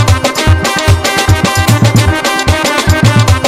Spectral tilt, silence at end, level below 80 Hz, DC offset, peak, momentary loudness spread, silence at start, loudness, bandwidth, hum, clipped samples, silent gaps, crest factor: -4.5 dB/octave; 0 s; -20 dBFS; under 0.1%; 0 dBFS; 2 LU; 0 s; -9 LUFS; 16 kHz; none; 0.3%; none; 8 dB